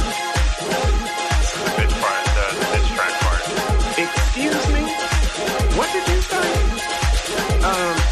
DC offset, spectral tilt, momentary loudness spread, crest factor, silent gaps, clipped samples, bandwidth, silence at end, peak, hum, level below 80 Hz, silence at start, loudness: under 0.1%; -4 dB/octave; 2 LU; 12 dB; none; under 0.1%; 13.5 kHz; 0 s; -6 dBFS; none; -22 dBFS; 0 s; -20 LUFS